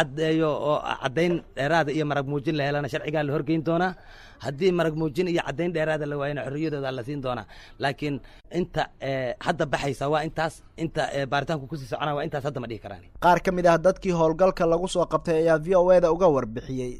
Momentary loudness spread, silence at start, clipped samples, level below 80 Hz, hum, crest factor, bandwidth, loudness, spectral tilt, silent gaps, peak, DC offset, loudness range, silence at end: 11 LU; 0 s; under 0.1%; -46 dBFS; none; 16 dB; 13.5 kHz; -25 LUFS; -6.5 dB/octave; none; -8 dBFS; under 0.1%; 7 LU; 0 s